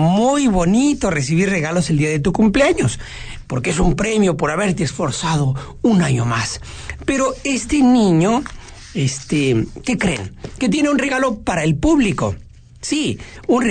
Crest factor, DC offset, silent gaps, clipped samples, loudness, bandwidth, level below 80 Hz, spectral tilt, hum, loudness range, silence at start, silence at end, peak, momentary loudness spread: 12 dB; under 0.1%; none; under 0.1%; -17 LUFS; 9.4 kHz; -34 dBFS; -5.5 dB/octave; none; 2 LU; 0 s; 0 s; -6 dBFS; 11 LU